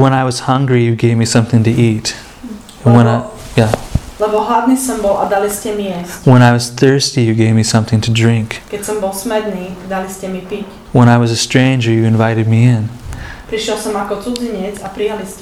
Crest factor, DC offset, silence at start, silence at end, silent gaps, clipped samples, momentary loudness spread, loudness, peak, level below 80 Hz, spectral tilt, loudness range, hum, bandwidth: 12 dB; under 0.1%; 0 s; 0 s; none; 0.2%; 13 LU; -13 LUFS; 0 dBFS; -36 dBFS; -6 dB/octave; 4 LU; none; 14.5 kHz